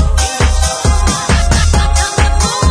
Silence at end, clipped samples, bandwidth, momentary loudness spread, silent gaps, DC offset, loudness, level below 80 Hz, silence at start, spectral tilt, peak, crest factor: 0 s; under 0.1%; 11 kHz; 2 LU; none; under 0.1%; -12 LUFS; -12 dBFS; 0 s; -4 dB/octave; 0 dBFS; 10 dB